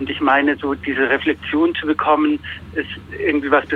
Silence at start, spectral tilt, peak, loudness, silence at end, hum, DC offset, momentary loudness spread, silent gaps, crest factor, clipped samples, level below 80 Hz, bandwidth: 0 s; -7 dB/octave; -2 dBFS; -18 LUFS; 0 s; none; under 0.1%; 10 LU; none; 16 dB; under 0.1%; -46 dBFS; 4.6 kHz